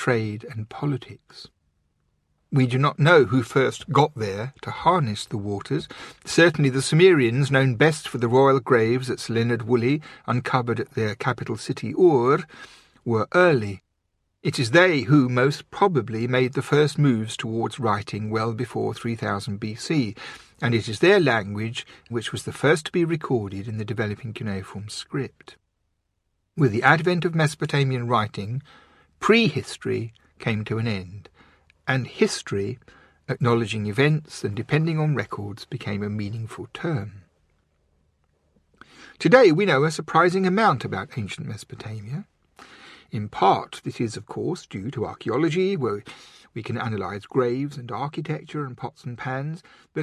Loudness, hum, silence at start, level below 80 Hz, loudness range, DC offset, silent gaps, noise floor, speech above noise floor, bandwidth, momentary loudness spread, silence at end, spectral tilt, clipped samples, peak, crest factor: -23 LUFS; none; 0 s; -56 dBFS; 7 LU; under 0.1%; none; -74 dBFS; 51 dB; 12.5 kHz; 16 LU; 0 s; -6 dB/octave; under 0.1%; 0 dBFS; 22 dB